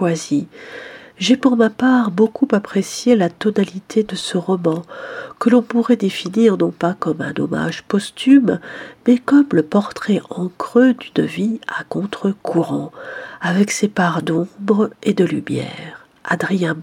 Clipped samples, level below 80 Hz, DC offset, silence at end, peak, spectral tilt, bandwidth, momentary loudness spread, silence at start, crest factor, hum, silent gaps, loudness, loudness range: under 0.1%; -62 dBFS; under 0.1%; 0 s; 0 dBFS; -6 dB/octave; 14.5 kHz; 13 LU; 0 s; 16 dB; none; none; -17 LUFS; 3 LU